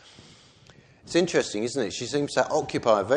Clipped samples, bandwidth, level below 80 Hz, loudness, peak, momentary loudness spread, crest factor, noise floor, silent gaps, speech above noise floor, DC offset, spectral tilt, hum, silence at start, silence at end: under 0.1%; 10 kHz; -62 dBFS; -26 LUFS; -6 dBFS; 5 LU; 20 dB; -54 dBFS; none; 30 dB; under 0.1%; -4 dB/octave; none; 0.2 s; 0 s